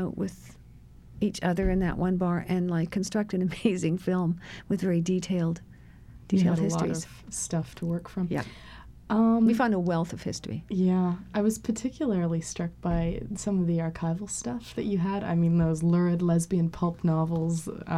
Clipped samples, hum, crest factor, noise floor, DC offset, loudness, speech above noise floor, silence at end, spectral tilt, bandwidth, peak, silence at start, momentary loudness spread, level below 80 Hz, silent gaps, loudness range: under 0.1%; none; 16 dB; -50 dBFS; under 0.1%; -28 LUFS; 23 dB; 0 s; -6.5 dB/octave; 12.5 kHz; -12 dBFS; 0 s; 9 LU; -46 dBFS; none; 3 LU